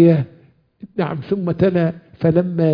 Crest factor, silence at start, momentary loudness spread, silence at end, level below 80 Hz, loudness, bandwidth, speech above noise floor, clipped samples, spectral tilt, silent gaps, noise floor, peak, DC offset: 16 dB; 0 s; 8 LU; 0 s; -50 dBFS; -19 LUFS; 5.2 kHz; 35 dB; under 0.1%; -11.5 dB/octave; none; -51 dBFS; -2 dBFS; under 0.1%